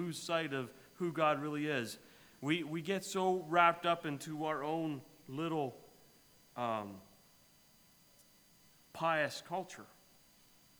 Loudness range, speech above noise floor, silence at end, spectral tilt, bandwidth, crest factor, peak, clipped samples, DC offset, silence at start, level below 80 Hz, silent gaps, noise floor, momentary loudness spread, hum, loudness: 9 LU; 30 dB; 0.95 s; -5 dB/octave; over 20 kHz; 24 dB; -14 dBFS; under 0.1%; under 0.1%; 0 s; -80 dBFS; none; -66 dBFS; 16 LU; none; -36 LUFS